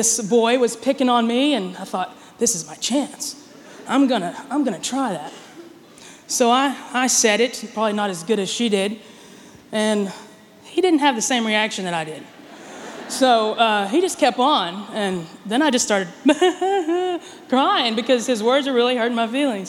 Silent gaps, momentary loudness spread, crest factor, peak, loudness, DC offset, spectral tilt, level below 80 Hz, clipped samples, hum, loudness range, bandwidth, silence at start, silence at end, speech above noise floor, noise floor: none; 13 LU; 18 dB; -4 dBFS; -20 LUFS; under 0.1%; -2.5 dB/octave; -68 dBFS; under 0.1%; none; 4 LU; 17 kHz; 0 s; 0 s; 25 dB; -44 dBFS